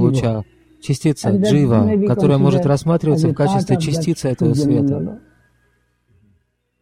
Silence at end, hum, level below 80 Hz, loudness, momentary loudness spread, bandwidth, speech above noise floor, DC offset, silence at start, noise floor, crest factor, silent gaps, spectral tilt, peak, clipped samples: 1.65 s; 60 Hz at -35 dBFS; -46 dBFS; -16 LUFS; 8 LU; 14 kHz; 47 dB; under 0.1%; 0 s; -63 dBFS; 14 dB; none; -7.5 dB/octave; -2 dBFS; under 0.1%